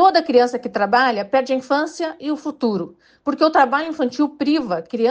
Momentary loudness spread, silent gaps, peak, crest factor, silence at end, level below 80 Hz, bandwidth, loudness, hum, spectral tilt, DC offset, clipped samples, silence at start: 10 LU; none; -4 dBFS; 16 dB; 0 s; -64 dBFS; 8.8 kHz; -19 LUFS; none; -5 dB/octave; under 0.1%; under 0.1%; 0 s